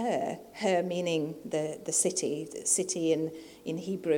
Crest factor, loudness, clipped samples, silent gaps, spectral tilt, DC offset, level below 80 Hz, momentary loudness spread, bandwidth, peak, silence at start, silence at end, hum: 18 dB; -30 LUFS; under 0.1%; none; -3.5 dB/octave; under 0.1%; -72 dBFS; 10 LU; 18.5 kHz; -14 dBFS; 0 s; 0 s; none